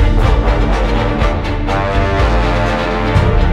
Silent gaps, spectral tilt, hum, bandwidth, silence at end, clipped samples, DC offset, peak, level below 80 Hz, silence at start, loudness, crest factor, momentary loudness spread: none; -7 dB/octave; none; 9.2 kHz; 0 s; under 0.1%; under 0.1%; -2 dBFS; -16 dBFS; 0 s; -15 LUFS; 10 dB; 3 LU